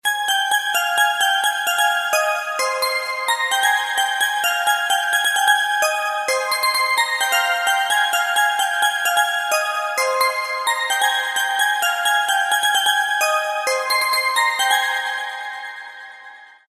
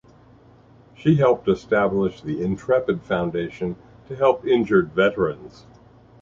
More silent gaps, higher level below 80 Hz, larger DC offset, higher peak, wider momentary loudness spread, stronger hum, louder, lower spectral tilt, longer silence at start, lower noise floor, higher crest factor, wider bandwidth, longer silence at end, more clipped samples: neither; second, -84 dBFS vs -52 dBFS; neither; about the same, -4 dBFS vs -4 dBFS; second, 5 LU vs 11 LU; neither; first, -18 LUFS vs -21 LUFS; second, 4 dB/octave vs -8 dB/octave; second, 0.05 s vs 1 s; second, -42 dBFS vs -51 dBFS; about the same, 16 dB vs 18 dB; first, 14 kHz vs 7.4 kHz; second, 0.25 s vs 0.75 s; neither